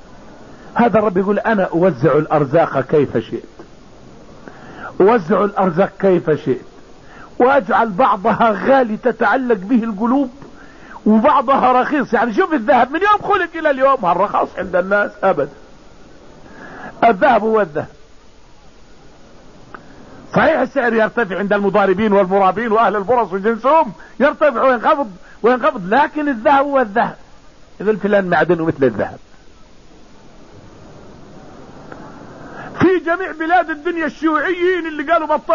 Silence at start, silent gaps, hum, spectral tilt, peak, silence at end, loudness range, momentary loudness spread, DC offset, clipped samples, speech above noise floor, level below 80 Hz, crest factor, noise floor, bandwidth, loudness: 0.15 s; none; none; -7.5 dB/octave; -2 dBFS; 0 s; 5 LU; 10 LU; 0.6%; under 0.1%; 29 dB; -48 dBFS; 14 dB; -44 dBFS; 7.4 kHz; -15 LUFS